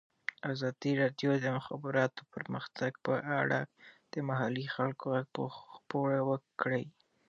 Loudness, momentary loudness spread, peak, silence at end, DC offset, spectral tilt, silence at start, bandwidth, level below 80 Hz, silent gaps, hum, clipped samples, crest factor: -35 LUFS; 10 LU; -14 dBFS; 0.4 s; under 0.1%; -7 dB/octave; 0.45 s; 7.2 kHz; -80 dBFS; none; none; under 0.1%; 22 dB